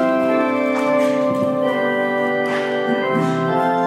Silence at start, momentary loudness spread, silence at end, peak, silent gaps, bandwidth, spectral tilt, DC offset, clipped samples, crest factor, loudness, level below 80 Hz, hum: 0 s; 2 LU; 0 s; -6 dBFS; none; 15.5 kHz; -6.5 dB/octave; under 0.1%; under 0.1%; 12 dB; -18 LUFS; -70 dBFS; none